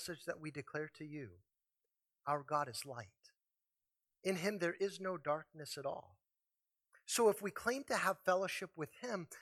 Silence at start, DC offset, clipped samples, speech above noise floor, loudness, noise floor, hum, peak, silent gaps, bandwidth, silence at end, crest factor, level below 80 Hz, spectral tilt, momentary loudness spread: 0 s; under 0.1%; under 0.1%; over 50 dB; -40 LUFS; under -90 dBFS; none; -20 dBFS; none; 16 kHz; 0 s; 22 dB; -82 dBFS; -3.5 dB/octave; 15 LU